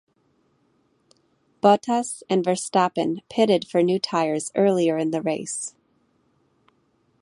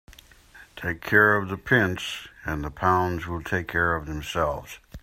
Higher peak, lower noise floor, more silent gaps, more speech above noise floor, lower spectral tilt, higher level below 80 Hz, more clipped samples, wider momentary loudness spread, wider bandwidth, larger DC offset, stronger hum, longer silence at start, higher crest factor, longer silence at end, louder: about the same, -2 dBFS vs -4 dBFS; first, -66 dBFS vs -51 dBFS; neither; first, 44 dB vs 26 dB; about the same, -5 dB/octave vs -5.5 dB/octave; second, -72 dBFS vs -46 dBFS; neither; second, 7 LU vs 14 LU; second, 11.5 kHz vs 16 kHz; neither; neither; first, 1.65 s vs 0.1 s; about the same, 22 dB vs 22 dB; first, 1.55 s vs 0.05 s; about the same, -22 LUFS vs -24 LUFS